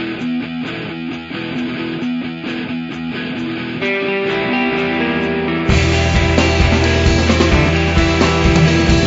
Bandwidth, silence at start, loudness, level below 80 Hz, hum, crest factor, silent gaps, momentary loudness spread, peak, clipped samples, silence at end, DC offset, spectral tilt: 7.8 kHz; 0 s; -16 LUFS; -24 dBFS; none; 16 dB; none; 11 LU; 0 dBFS; under 0.1%; 0 s; under 0.1%; -5.5 dB/octave